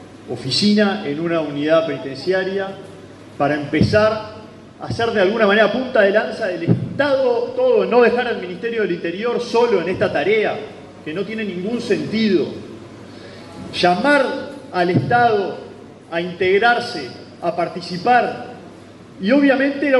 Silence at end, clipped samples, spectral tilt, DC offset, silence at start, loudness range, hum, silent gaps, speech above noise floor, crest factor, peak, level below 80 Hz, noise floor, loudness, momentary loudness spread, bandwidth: 0 s; under 0.1%; -6 dB/octave; under 0.1%; 0 s; 4 LU; none; none; 23 dB; 16 dB; -2 dBFS; -52 dBFS; -40 dBFS; -18 LUFS; 19 LU; 11.5 kHz